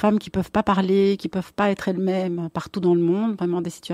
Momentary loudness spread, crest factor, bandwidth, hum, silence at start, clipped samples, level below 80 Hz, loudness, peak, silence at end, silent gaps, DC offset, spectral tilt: 8 LU; 14 dB; 14 kHz; none; 0 s; under 0.1%; -52 dBFS; -22 LUFS; -6 dBFS; 0 s; none; under 0.1%; -7 dB/octave